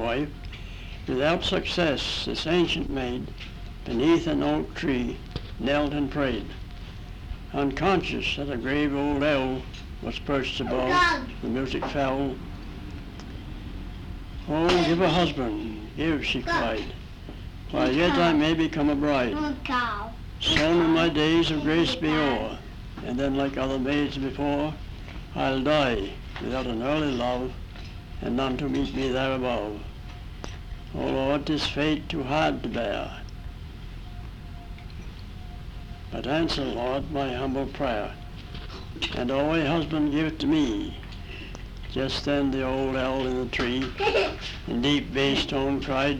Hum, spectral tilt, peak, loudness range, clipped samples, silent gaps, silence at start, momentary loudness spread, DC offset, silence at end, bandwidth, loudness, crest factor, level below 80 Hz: none; -5.5 dB/octave; -6 dBFS; 6 LU; under 0.1%; none; 0 s; 18 LU; under 0.1%; 0 s; 12.5 kHz; -26 LUFS; 20 dB; -40 dBFS